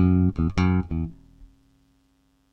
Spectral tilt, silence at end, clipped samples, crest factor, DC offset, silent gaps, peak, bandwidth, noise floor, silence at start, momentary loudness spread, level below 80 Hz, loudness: -9 dB/octave; 1.1 s; under 0.1%; 16 dB; under 0.1%; none; -8 dBFS; 6.6 kHz; -65 dBFS; 0 s; 10 LU; -38 dBFS; -24 LUFS